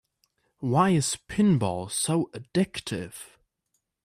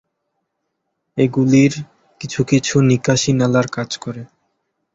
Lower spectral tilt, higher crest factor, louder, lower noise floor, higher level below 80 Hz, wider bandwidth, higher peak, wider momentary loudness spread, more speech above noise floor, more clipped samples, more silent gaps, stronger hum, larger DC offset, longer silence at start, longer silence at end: about the same, -5 dB/octave vs -5.5 dB/octave; about the same, 18 dB vs 16 dB; second, -26 LUFS vs -16 LUFS; first, -78 dBFS vs -74 dBFS; second, -58 dBFS vs -52 dBFS; first, 15 kHz vs 8 kHz; second, -10 dBFS vs -2 dBFS; second, 13 LU vs 16 LU; second, 52 dB vs 58 dB; neither; neither; neither; neither; second, 0.6 s vs 1.15 s; about the same, 0.8 s vs 0.7 s